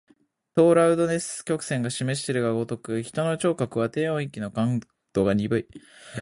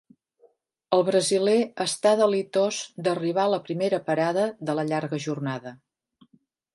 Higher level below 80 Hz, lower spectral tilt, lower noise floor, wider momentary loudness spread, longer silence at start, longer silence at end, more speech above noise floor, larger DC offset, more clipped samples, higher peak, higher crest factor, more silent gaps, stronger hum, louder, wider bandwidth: first, -58 dBFS vs -76 dBFS; first, -6 dB/octave vs -4.5 dB/octave; about the same, -63 dBFS vs -64 dBFS; first, 11 LU vs 8 LU; second, 0.55 s vs 0.9 s; second, 0 s vs 1 s; about the same, 39 dB vs 40 dB; neither; neither; about the same, -8 dBFS vs -6 dBFS; about the same, 18 dB vs 20 dB; neither; neither; about the same, -25 LUFS vs -24 LUFS; about the same, 11.5 kHz vs 11.5 kHz